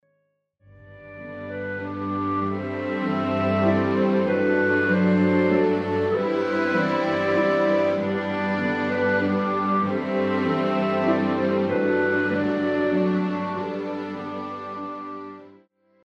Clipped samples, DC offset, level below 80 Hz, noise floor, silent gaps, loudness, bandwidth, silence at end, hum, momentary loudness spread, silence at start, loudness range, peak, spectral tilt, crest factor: under 0.1%; under 0.1%; -66 dBFS; -71 dBFS; none; -23 LUFS; 7.2 kHz; 0.55 s; none; 12 LU; 0.8 s; 5 LU; -10 dBFS; -8 dB/octave; 14 dB